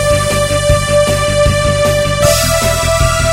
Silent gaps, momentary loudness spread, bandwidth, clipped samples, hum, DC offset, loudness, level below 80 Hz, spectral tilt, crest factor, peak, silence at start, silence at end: none; 2 LU; 16.5 kHz; under 0.1%; none; under 0.1%; -11 LUFS; -22 dBFS; -4 dB/octave; 12 dB; 0 dBFS; 0 s; 0 s